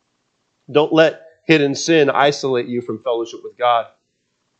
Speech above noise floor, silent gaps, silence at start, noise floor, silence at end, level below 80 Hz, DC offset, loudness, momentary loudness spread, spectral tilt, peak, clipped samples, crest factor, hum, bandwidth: 53 dB; none; 0.7 s; -69 dBFS; 0.75 s; -74 dBFS; under 0.1%; -17 LUFS; 10 LU; -4.5 dB/octave; 0 dBFS; under 0.1%; 18 dB; none; 8.6 kHz